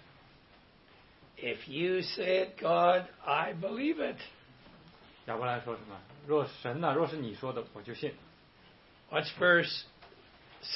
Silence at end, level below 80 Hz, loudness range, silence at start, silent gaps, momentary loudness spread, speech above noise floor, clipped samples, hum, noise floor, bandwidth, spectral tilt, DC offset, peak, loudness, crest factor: 0 s; -70 dBFS; 5 LU; 1.35 s; none; 19 LU; 28 dB; under 0.1%; none; -61 dBFS; 5.8 kHz; -8.5 dB/octave; under 0.1%; -12 dBFS; -32 LUFS; 22 dB